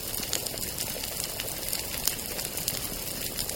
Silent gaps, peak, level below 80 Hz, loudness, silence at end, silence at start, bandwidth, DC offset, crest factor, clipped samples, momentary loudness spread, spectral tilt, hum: none; -2 dBFS; -48 dBFS; -30 LUFS; 0 s; 0 s; 17 kHz; under 0.1%; 32 dB; under 0.1%; 3 LU; -1.5 dB/octave; none